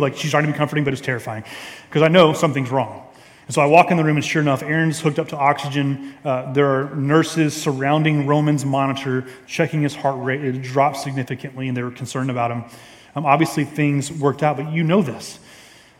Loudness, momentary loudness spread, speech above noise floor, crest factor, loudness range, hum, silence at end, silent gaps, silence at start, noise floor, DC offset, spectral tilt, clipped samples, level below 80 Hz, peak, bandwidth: -19 LUFS; 12 LU; 27 dB; 20 dB; 5 LU; none; 0.45 s; none; 0 s; -46 dBFS; under 0.1%; -6 dB/octave; under 0.1%; -62 dBFS; 0 dBFS; 15.5 kHz